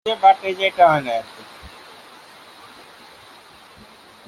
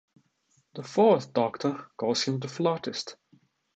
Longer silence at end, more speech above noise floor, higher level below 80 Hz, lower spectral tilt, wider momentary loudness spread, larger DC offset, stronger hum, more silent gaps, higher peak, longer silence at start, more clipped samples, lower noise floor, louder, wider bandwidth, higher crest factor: first, 2.6 s vs 0.6 s; second, 29 dB vs 43 dB; first, -58 dBFS vs -76 dBFS; about the same, -4.5 dB/octave vs -5 dB/octave; first, 26 LU vs 16 LU; neither; neither; neither; first, -2 dBFS vs -10 dBFS; second, 0.05 s vs 0.75 s; neither; second, -46 dBFS vs -70 dBFS; first, -17 LUFS vs -27 LUFS; first, 14 kHz vs 8.8 kHz; about the same, 20 dB vs 20 dB